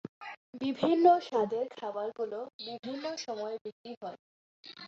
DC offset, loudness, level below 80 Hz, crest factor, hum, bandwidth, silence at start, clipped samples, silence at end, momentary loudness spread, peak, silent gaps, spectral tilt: under 0.1%; -32 LUFS; -80 dBFS; 22 dB; none; 7.6 kHz; 0.05 s; under 0.1%; 0 s; 20 LU; -10 dBFS; 0.09-0.21 s, 0.37-0.53 s, 2.54-2.59 s, 3.61-3.65 s, 3.72-3.84 s, 3.97-4.01 s, 4.19-4.63 s; -5 dB/octave